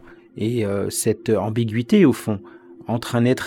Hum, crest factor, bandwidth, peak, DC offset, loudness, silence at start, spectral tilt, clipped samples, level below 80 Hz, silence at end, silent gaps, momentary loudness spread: none; 18 dB; 19.5 kHz; -4 dBFS; under 0.1%; -21 LUFS; 0.1 s; -6 dB/octave; under 0.1%; -58 dBFS; 0 s; none; 12 LU